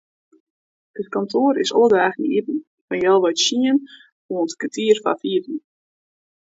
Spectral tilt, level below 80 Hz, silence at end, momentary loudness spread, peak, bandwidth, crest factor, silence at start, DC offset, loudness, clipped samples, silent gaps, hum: -3.5 dB/octave; -68 dBFS; 1 s; 13 LU; -2 dBFS; 8 kHz; 18 dB; 0.95 s; under 0.1%; -19 LUFS; under 0.1%; 2.67-2.88 s, 4.12-4.29 s; none